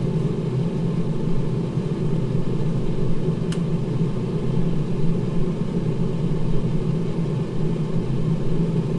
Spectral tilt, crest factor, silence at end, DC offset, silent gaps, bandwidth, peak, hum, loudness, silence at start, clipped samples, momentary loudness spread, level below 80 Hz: -9 dB/octave; 14 dB; 0 s; under 0.1%; none; 10 kHz; -8 dBFS; none; -24 LUFS; 0 s; under 0.1%; 1 LU; -32 dBFS